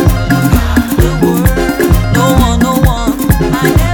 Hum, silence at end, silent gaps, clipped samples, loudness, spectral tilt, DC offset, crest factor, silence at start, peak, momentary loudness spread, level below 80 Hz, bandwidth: none; 0 s; none; under 0.1%; -10 LUFS; -6 dB/octave; under 0.1%; 10 dB; 0 s; 0 dBFS; 2 LU; -16 dBFS; 19.5 kHz